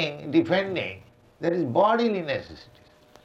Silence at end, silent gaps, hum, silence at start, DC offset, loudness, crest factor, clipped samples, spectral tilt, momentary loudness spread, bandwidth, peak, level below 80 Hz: 0.6 s; none; none; 0 s; under 0.1%; -25 LUFS; 18 dB; under 0.1%; -7 dB/octave; 12 LU; 7.6 kHz; -8 dBFS; -62 dBFS